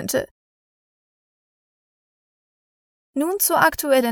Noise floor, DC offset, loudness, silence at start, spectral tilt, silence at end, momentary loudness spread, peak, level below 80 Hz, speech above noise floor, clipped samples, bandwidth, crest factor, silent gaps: under -90 dBFS; under 0.1%; -19 LUFS; 0 s; -2.5 dB/octave; 0 s; 14 LU; -2 dBFS; -56 dBFS; over 71 dB; under 0.1%; over 20 kHz; 22 dB; 0.31-3.13 s